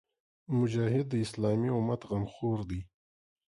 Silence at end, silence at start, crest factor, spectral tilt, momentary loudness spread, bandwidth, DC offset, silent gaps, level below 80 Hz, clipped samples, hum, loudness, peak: 0.65 s; 0.5 s; 16 dB; -8 dB/octave; 7 LU; 11.5 kHz; under 0.1%; none; -54 dBFS; under 0.1%; none; -32 LUFS; -16 dBFS